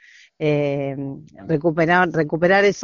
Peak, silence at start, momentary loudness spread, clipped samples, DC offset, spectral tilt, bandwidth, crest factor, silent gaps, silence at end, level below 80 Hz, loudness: -2 dBFS; 0.4 s; 14 LU; under 0.1%; under 0.1%; -5 dB/octave; 7.2 kHz; 18 dB; none; 0 s; -54 dBFS; -19 LUFS